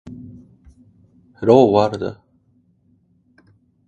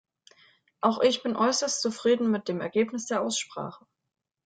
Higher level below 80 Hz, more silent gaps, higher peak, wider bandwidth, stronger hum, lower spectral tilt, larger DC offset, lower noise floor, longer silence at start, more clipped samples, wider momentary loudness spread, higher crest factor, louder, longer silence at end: first, -54 dBFS vs -72 dBFS; neither; first, 0 dBFS vs -8 dBFS; about the same, 8.8 kHz vs 9.4 kHz; neither; first, -8 dB/octave vs -3.5 dB/octave; neither; about the same, -59 dBFS vs -62 dBFS; second, 0.05 s vs 0.85 s; neither; first, 25 LU vs 7 LU; about the same, 20 dB vs 20 dB; first, -16 LUFS vs -27 LUFS; first, 1.75 s vs 0.7 s